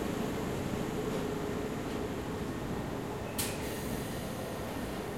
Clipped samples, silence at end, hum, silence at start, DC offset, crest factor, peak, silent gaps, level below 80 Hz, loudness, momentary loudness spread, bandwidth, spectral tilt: under 0.1%; 0 s; none; 0 s; 0.1%; 18 dB; -18 dBFS; none; -50 dBFS; -36 LUFS; 3 LU; 16.5 kHz; -5 dB/octave